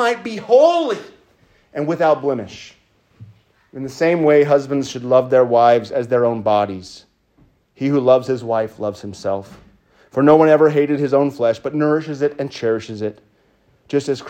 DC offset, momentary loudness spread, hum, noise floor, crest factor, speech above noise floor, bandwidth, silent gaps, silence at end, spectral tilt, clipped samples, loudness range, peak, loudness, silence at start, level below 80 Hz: under 0.1%; 14 LU; none; -58 dBFS; 16 dB; 41 dB; 9.4 kHz; none; 0 s; -6.5 dB/octave; under 0.1%; 5 LU; 0 dBFS; -17 LUFS; 0 s; -62 dBFS